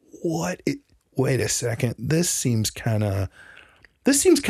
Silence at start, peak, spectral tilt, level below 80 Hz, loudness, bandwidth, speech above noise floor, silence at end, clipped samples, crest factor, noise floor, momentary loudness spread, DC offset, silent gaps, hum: 0.15 s; -6 dBFS; -4.5 dB/octave; -52 dBFS; -24 LUFS; 15.5 kHz; 30 dB; 0 s; under 0.1%; 18 dB; -52 dBFS; 9 LU; under 0.1%; none; none